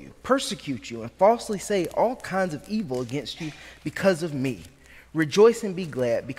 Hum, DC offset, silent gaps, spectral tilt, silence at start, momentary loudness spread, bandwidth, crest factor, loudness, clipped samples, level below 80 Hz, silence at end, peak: none; under 0.1%; none; -5 dB/octave; 0 s; 15 LU; 16 kHz; 18 dB; -25 LUFS; under 0.1%; -56 dBFS; 0.05 s; -6 dBFS